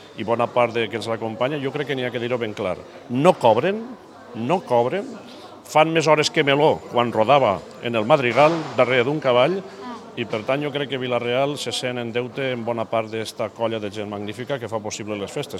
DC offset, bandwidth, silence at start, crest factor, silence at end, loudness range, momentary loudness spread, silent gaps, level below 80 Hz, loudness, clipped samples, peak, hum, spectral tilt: under 0.1%; 13.5 kHz; 0 s; 22 dB; 0 s; 7 LU; 13 LU; none; -66 dBFS; -21 LUFS; under 0.1%; 0 dBFS; none; -5 dB/octave